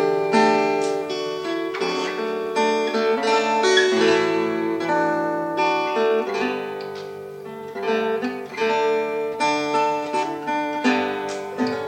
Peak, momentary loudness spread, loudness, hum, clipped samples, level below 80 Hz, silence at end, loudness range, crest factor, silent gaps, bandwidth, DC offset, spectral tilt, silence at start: -4 dBFS; 11 LU; -22 LUFS; none; under 0.1%; -70 dBFS; 0 s; 4 LU; 18 dB; none; 16 kHz; under 0.1%; -4 dB/octave; 0 s